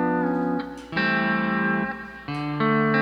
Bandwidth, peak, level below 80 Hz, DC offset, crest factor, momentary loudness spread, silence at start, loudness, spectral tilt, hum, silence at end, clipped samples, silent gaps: 9.2 kHz; -8 dBFS; -54 dBFS; under 0.1%; 16 dB; 9 LU; 0 s; -24 LUFS; -7.5 dB/octave; none; 0 s; under 0.1%; none